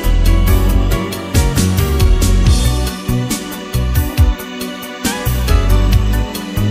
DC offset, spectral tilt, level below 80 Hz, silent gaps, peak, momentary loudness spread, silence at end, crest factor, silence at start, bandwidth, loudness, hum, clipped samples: under 0.1%; -5.5 dB/octave; -16 dBFS; none; 0 dBFS; 7 LU; 0 s; 12 dB; 0 s; 16 kHz; -15 LUFS; none; under 0.1%